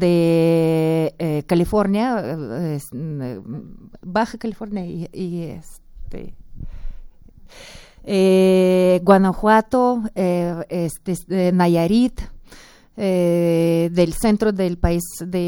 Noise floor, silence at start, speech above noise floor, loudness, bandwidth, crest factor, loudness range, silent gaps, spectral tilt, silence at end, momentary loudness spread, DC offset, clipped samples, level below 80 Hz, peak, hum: -45 dBFS; 0 s; 26 dB; -19 LUFS; 18 kHz; 20 dB; 12 LU; none; -7 dB/octave; 0 s; 20 LU; under 0.1%; under 0.1%; -38 dBFS; 0 dBFS; none